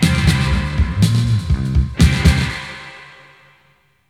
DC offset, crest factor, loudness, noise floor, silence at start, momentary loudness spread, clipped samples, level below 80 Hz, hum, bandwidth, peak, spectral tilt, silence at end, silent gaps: under 0.1%; 16 dB; -16 LUFS; -57 dBFS; 0 s; 17 LU; under 0.1%; -22 dBFS; none; 15 kHz; 0 dBFS; -5.5 dB/octave; 1.05 s; none